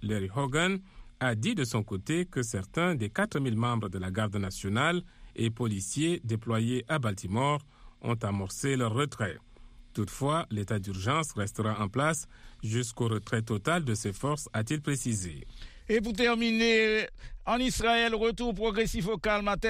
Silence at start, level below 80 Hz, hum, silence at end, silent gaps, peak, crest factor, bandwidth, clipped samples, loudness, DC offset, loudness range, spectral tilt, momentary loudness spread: 0 s; -48 dBFS; none; 0 s; none; -12 dBFS; 18 dB; 15.5 kHz; under 0.1%; -30 LUFS; under 0.1%; 4 LU; -5 dB/octave; 9 LU